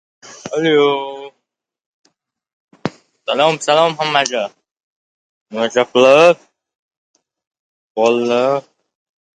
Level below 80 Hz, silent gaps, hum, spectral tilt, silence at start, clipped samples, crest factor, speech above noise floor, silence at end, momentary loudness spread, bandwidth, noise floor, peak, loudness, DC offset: -66 dBFS; 1.86-2.04 s, 2.53-2.68 s, 4.71-4.76 s, 4.83-5.46 s, 6.75-6.91 s, 6.97-7.14 s, 7.47-7.51 s, 7.59-7.95 s; none; -4 dB/octave; 0.25 s; under 0.1%; 18 dB; 61 dB; 0.75 s; 18 LU; 9.6 kHz; -75 dBFS; 0 dBFS; -14 LUFS; under 0.1%